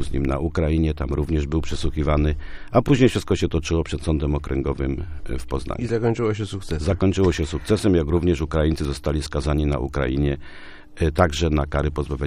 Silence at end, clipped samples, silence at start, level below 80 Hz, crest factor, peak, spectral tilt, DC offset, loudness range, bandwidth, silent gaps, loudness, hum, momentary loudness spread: 0 s; under 0.1%; 0 s; -30 dBFS; 18 dB; -2 dBFS; -7 dB/octave; under 0.1%; 3 LU; 13.5 kHz; none; -23 LUFS; none; 8 LU